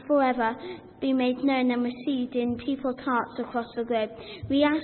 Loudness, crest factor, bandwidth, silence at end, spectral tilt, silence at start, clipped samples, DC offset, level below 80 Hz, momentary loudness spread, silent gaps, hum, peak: -27 LUFS; 16 dB; 4.4 kHz; 0 s; -9.5 dB/octave; 0 s; under 0.1%; under 0.1%; -60 dBFS; 8 LU; none; none; -10 dBFS